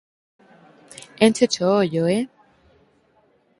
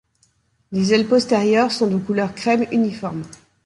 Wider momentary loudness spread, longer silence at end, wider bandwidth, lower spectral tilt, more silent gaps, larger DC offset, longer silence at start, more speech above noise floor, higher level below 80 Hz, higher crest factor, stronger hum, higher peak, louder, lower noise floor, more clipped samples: first, 20 LU vs 12 LU; first, 1.35 s vs 0.3 s; about the same, 11.5 kHz vs 11.5 kHz; about the same, -5 dB/octave vs -5.5 dB/octave; neither; neither; first, 1.2 s vs 0.7 s; about the same, 42 dB vs 44 dB; second, -64 dBFS vs -58 dBFS; first, 22 dB vs 16 dB; neither; about the same, -2 dBFS vs -2 dBFS; about the same, -19 LUFS vs -19 LUFS; about the same, -61 dBFS vs -63 dBFS; neither